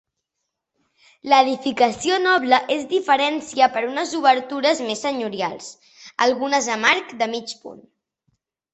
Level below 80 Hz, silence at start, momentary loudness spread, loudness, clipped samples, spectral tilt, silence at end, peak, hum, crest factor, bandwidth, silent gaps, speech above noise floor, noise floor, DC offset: -66 dBFS; 1.25 s; 12 LU; -20 LUFS; under 0.1%; -2 dB/octave; 0.95 s; -2 dBFS; none; 20 dB; 8.4 kHz; none; 60 dB; -80 dBFS; under 0.1%